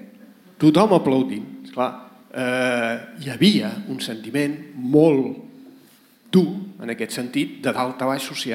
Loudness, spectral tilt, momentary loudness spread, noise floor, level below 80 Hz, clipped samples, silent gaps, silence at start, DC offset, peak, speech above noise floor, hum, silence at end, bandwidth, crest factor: -21 LUFS; -6 dB/octave; 15 LU; -52 dBFS; -68 dBFS; under 0.1%; none; 0 s; under 0.1%; -2 dBFS; 32 dB; none; 0 s; 16.5 kHz; 18 dB